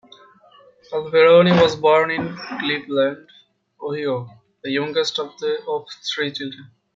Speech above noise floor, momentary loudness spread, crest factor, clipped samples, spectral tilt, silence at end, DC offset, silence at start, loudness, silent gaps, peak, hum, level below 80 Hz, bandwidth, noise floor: 32 dB; 17 LU; 18 dB; under 0.1%; -5.5 dB/octave; 0.3 s; under 0.1%; 0.9 s; -19 LUFS; none; -2 dBFS; none; -62 dBFS; 7.6 kHz; -51 dBFS